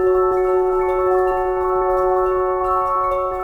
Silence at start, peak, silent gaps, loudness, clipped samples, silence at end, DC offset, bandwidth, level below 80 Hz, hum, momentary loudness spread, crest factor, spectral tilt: 0 s; -6 dBFS; none; -18 LUFS; under 0.1%; 0 s; under 0.1%; 3.8 kHz; -38 dBFS; none; 2 LU; 10 dB; -8 dB/octave